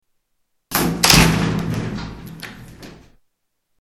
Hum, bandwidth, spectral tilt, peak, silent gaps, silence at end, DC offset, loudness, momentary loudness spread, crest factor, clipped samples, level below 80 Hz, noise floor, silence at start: none; 17 kHz; -3.5 dB/octave; 0 dBFS; none; 0.85 s; under 0.1%; -16 LUFS; 23 LU; 20 dB; under 0.1%; -34 dBFS; -71 dBFS; 0.7 s